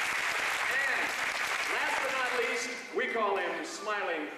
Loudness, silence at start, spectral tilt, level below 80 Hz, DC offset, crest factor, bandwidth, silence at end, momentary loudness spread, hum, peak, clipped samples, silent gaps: -30 LUFS; 0 s; -1 dB/octave; -70 dBFS; under 0.1%; 14 dB; 15.5 kHz; 0 s; 5 LU; none; -18 dBFS; under 0.1%; none